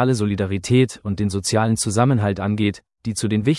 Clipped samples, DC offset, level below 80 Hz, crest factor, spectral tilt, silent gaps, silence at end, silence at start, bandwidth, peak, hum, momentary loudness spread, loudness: under 0.1%; under 0.1%; -52 dBFS; 16 dB; -5.5 dB/octave; none; 0 s; 0 s; 12 kHz; -4 dBFS; none; 6 LU; -20 LUFS